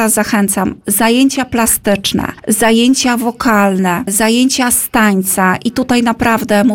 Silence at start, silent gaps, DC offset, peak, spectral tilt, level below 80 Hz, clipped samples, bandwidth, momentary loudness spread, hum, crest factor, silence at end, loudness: 0 s; none; under 0.1%; 0 dBFS; -3.5 dB/octave; -42 dBFS; under 0.1%; 17 kHz; 4 LU; none; 12 dB; 0 s; -12 LUFS